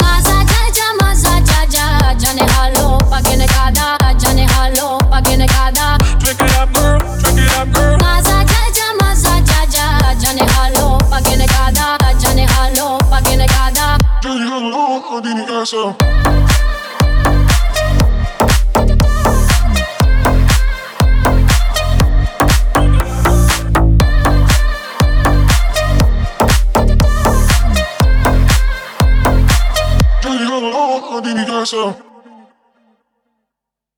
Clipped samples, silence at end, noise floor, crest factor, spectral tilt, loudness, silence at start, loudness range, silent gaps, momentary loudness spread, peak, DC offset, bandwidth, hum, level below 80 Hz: under 0.1%; 2 s; -81 dBFS; 10 dB; -4.5 dB/octave; -12 LUFS; 0 s; 3 LU; none; 5 LU; 0 dBFS; under 0.1%; 20 kHz; none; -12 dBFS